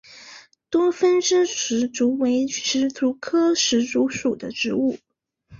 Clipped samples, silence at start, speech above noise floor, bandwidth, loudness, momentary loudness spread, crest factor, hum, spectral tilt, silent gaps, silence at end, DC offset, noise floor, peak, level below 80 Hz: under 0.1%; 0.1 s; 30 dB; 7.6 kHz; -21 LUFS; 7 LU; 14 dB; none; -2.5 dB/octave; none; 0.05 s; under 0.1%; -51 dBFS; -8 dBFS; -62 dBFS